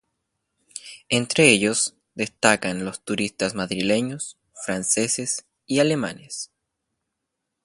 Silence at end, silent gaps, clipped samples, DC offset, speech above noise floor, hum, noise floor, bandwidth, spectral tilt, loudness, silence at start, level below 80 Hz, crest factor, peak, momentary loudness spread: 1.2 s; none; under 0.1%; under 0.1%; 58 dB; none; -81 dBFS; 11.5 kHz; -3 dB/octave; -22 LUFS; 0.75 s; -60 dBFS; 24 dB; 0 dBFS; 18 LU